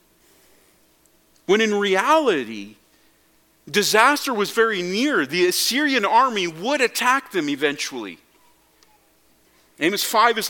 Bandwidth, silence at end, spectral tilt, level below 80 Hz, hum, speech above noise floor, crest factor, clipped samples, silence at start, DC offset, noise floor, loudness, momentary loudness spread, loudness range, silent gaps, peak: 17.5 kHz; 0 s; -2.5 dB/octave; -70 dBFS; none; 39 dB; 22 dB; under 0.1%; 1.5 s; under 0.1%; -59 dBFS; -19 LUFS; 9 LU; 6 LU; none; 0 dBFS